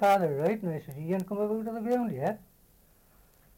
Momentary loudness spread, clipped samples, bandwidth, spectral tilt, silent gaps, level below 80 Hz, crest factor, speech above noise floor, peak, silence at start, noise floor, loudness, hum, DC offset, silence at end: 9 LU; under 0.1%; 17 kHz; -7.5 dB/octave; none; -64 dBFS; 18 dB; 33 dB; -12 dBFS; 0 s; -62 dBFS; -30 LUFS; none; under 0.1%; 1.2 s